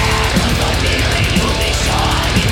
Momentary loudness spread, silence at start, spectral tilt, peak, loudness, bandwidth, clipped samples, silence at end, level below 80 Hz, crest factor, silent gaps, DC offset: 1 LU; 0 s; -4 dB/octave; -4 dBFS; -14 LUFS; 17 kHz; under 0.1%; 0 s; -20 dBFS; 10 dB; none; under 0.1%